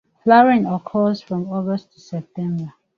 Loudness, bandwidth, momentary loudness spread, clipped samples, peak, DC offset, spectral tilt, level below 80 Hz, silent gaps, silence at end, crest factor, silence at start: -19 LUFS; 7 kHz; 17 LU; under 0.1%; -2 dBFS; under 0.1%; -8.5 dB/octave; -62 dBFS; none; 0.3 s; 18 dB; 0.25 s